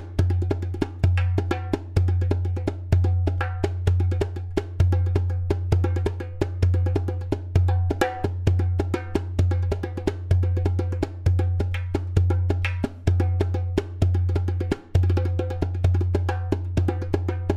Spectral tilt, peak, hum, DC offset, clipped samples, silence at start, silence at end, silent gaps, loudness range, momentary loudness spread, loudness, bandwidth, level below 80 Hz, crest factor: -8 dB/octave; -6 dBFS; none; under 0.1%; under 0.1%; 0 s; 0 s; none; 1 LU; 5 LU; -24 LUFS; 7.6 kHz; -34 dBFS; 16 dB